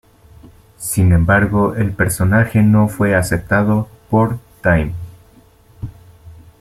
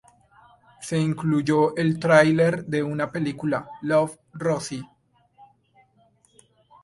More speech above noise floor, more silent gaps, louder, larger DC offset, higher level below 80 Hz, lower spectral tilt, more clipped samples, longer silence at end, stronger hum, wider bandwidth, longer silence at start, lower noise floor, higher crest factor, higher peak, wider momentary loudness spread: second, 34 dB vs 39 dB; neither; first, -15 LUFS vs -23 LUFS; neither; first, -36 dBFS vs -62 dBFS; about the same, -7 dB/octave vs -6.5 dB/octave; neither; second, 0.25 s vs 2 s; neither; first, 15.5 kHz vs 11.5 kHz; about the same, 0.8 s vs 0.8 s; second, -48 dBFS vs -62 dBFS; second, 14 dB vs 22 dB; about the same, -2 dBFS vs -2 dBFS; first, 18 LU vs 12 LU